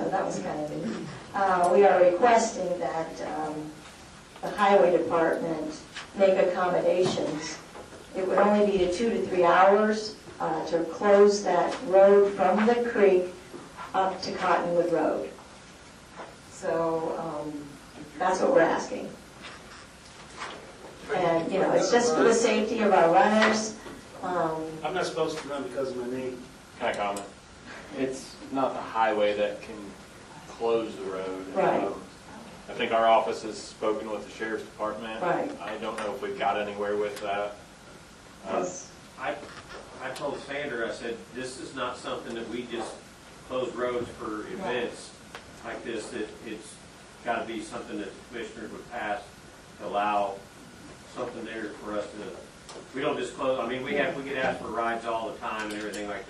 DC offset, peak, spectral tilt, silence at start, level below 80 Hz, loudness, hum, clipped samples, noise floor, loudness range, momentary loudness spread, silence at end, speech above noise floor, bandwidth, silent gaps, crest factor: under 0.1%; -8 dBFS; -4.5 dB/octave; 0 s; -60 dBFS; -27 LUFS; none; under 0.1%; -49 dBFS; 12 LU; 22 LU; 0 s; 22 dB; 12.5 kHz; none; 20 dB